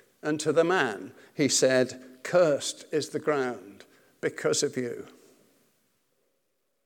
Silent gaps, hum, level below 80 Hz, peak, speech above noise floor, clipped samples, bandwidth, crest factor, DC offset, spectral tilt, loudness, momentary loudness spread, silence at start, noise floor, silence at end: none; none; -84 dBFS; -8 dBFS; 51 dB; under 0.1%; 18 kHz; 20 dB; under 0.1%; -3.5 dB/octave; -27 LUFS; 15 LU; 0.25 s; -78 dBFS; 1.75 s